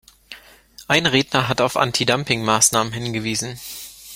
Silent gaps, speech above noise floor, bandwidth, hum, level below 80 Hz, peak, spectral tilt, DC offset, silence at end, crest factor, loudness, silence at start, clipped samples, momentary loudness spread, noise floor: none; 27 dB; 16.5 kHz; none; -52 dBFS; 0 dBFS; -3 dB/octave; under 0.1%; 0 s; 20 dB; -18 LUFS; 0.3 s; under 0.1%; 14 LU; -46 dBFS